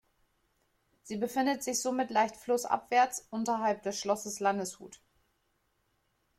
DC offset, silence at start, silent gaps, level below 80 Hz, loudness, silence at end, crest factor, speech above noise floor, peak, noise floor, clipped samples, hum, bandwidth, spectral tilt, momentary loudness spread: under 0.1%; 1.05 s; none; -74 dBFS; -31 LUFS; 1.45 s; 20 dB; 45 dB; -14 dBFS; -76 dBFS; under 0.1%; none; 16.5 kHz; -3 dB/octave; 8 LU